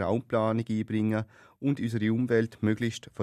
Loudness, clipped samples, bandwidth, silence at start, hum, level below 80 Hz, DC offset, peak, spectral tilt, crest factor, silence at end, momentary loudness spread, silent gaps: -29 LUFS; under 0.1%; 12.5 kHz; 0 s; none; -66 dBFS; under 0.1%; -12 dBFS; -7.5 dB/octave; 16 dB; 0 s; 7 LU; none